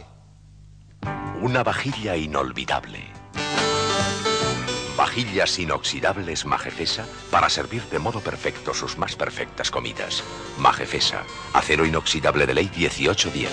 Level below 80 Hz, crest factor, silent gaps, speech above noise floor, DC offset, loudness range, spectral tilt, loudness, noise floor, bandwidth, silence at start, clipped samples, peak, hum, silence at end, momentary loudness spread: -44 dBFS; 22 dB; none; 25 dB; under 0.1%; 4 LU; -3.5 dB/octave; -23 LUFS; -48 dBFS; 10.5 kHz; 0 s; under 0.1%; -4 dBFS; none; 0 s; 8 LU